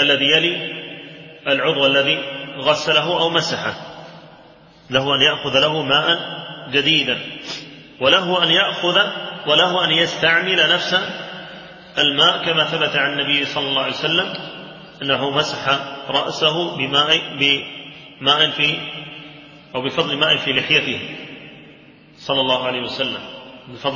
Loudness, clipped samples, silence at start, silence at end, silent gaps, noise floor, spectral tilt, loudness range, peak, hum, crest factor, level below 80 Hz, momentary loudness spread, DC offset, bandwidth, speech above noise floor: -17 LUFS; under 0.1%; 0 s; 0 s; none; -46 dBFS; -3.5 dB/octave; 4 LU; 0 dBFS; none; 18 dB; -58 dBFS; 18 LU; under 0.1%; 7.6 kHz; 28 dB